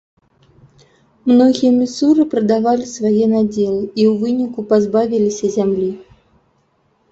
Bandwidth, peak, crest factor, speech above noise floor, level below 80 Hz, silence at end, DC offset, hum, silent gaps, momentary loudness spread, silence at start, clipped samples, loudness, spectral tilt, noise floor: 8 kHz; -2 dBFS; 14 dB; 46 dB; -56 dBFS; 1.1 s; under 0.1%; none; none; 7 LU; 1.25 s; under 0.1%; -15 LUFS; -6.5 dB/octave; -60 dBFS